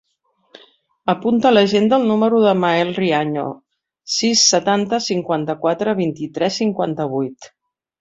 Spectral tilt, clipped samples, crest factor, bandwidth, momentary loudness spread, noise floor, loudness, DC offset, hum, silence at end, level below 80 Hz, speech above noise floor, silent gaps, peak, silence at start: -4 dB/octave; under 0.1%; 16 dB; 7.8 kHz; 10 LU; -64 dBFS; -17 LUFS; under 0.1%; none; 0.55 s; -60 dBFS; 47 dB; none; -2 dBFS; 1.05 s